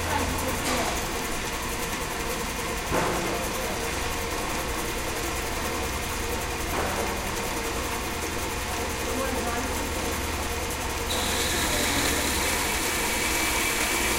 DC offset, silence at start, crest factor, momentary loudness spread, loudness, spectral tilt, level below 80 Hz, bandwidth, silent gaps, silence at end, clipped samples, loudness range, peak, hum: under 0.1%; 0 s; 16 dB; 6 LU; -27 LUFS; -2.5 dB/octave; -36 dBFS; 16 kHz; none; 0 s; under 0.1%; 4 LU; -12 dBFS; none